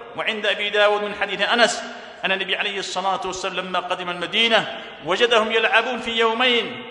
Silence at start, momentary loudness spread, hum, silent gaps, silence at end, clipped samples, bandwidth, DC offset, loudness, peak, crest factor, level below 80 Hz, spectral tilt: 0 s; 9 LU; none; none; 0 s; under 0.1%; 11 kHz; under 0.1%; -20 LUFS; -2 dBFS; 20 dB; -62 dBFS; -2 dB/octave